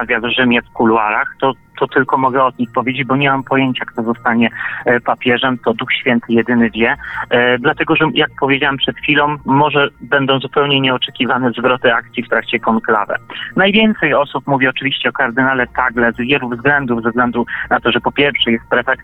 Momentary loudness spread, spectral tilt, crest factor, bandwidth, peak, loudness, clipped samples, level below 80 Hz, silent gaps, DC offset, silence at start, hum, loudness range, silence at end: 5 LU; -8 dB/octave; 14 dB; 4.1 kHz; 0 dBFS; -14 LUFS; under 0.1%; -46 dBFS; none; under 0.1%; 0 s; none; 2 LU; 0 s